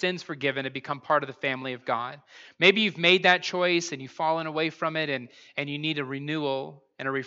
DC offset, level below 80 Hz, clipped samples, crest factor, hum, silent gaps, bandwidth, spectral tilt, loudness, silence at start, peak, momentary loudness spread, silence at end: under 0.1%; -82 dBFS; under 0.1%; 22 dB; none; none; 7.8 kHz; -4 dB/octave; -26 LUFS; 0 s; -4 dBFS; 14 LU; 0 s